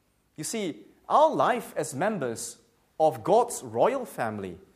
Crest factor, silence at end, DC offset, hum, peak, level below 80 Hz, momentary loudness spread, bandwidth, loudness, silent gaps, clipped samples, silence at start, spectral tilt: 18 dB; 0.15 s; under 0.1%; none; -10 dBFS; -70 dBFS; 14 LU; 15.5 kHz; -27 LUFS; none; under 0.1%; 0.4 s; -4.5 dB/octave